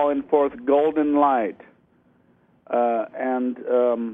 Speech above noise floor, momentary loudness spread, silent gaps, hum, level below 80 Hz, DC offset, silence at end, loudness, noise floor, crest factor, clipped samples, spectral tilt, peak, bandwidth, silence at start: 39 dB; 7 LU; none; none; -64 dBFS; under 0.1%; 0 s; -22 LUFS; -60 dBFS; 16 dB; under 0.1%; -8.5 dB/octave; -6 dBFS; 3.8 kHz; 0 s